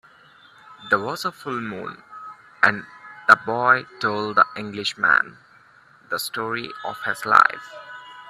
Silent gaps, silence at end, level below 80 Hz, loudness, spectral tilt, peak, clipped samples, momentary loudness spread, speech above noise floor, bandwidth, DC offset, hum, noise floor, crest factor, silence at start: none; 0 s; -68 dBFS; -21 LUFS; -3.5 dB/octave; 0 dBFS; under 0.1%; 23 LU; 31 dB; 15.5 kHz; under 0.1%; none; -53 dBFS; 24 dB; 0.7 s